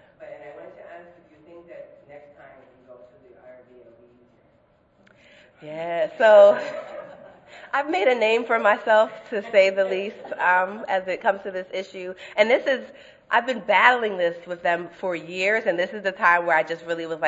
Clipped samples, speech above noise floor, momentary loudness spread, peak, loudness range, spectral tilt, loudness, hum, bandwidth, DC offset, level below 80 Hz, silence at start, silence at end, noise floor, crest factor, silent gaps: under 0.1%; 39 dB; 20 LU; 0 dBFS; 4 LU; -4 dB/octave; -21 LUFS; none; 8 kHz; under 0.1%; -72 dBFS; 0.2 s; 0 s; -61 dBFS; 22 dB; none